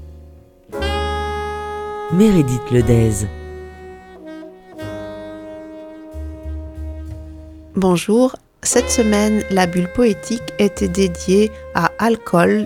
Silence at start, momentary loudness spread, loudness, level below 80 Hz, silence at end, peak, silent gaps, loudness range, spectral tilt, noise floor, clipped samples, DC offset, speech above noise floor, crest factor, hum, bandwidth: 0 s; 20 LU; -17 LUFS; -34 dBFS; 0 s; 0 dBFS; none; 15 LU; -5.5 dB/octave; -43 dBFS; under 0.1%; under 0.1%; 28 dB; 18 dB; none; 17 kHz